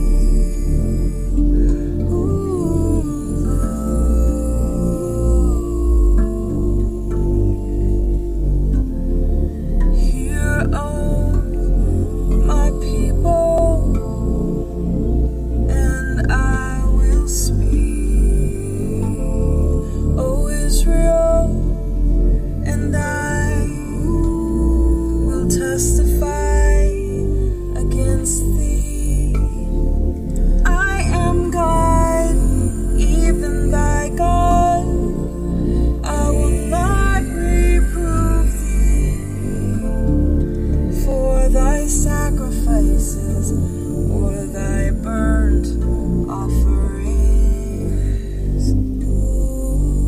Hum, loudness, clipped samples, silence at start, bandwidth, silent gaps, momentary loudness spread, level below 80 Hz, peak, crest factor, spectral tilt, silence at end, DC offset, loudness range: none; -19 LUFS; under 0.1%; 0 s; 14.5 kHz; none; 5 LU; -18 dBFS; -2 dBFS; 14 dB; -6.5 dB/octave; 0 s; under 0.1%; 2 LU